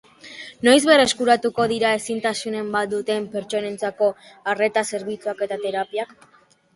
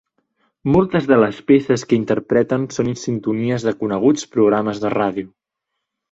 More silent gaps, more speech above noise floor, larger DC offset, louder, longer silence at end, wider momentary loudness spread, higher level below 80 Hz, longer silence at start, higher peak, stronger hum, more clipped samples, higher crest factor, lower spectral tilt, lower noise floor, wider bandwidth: neither; second, 20 dB vs 62 dB; neither; second, -21 LUFS vs -18 LUFS; second, 0.7 s vs 0.85 s; first, 13 LU vs 7 LU; second, -62 dBFS vs -50 dBFS; second, 0.25 s vs 0.65 s; about the same, -2 dBFS vs -2 dBFS; neither; neither; about the same, 20 dB vs 16 dB; second, -3 dB/octave vs -6.5 dB/octave; second, -41 dBFS vs -79 dBFS; first, 11.5 kHz vs 8 kHz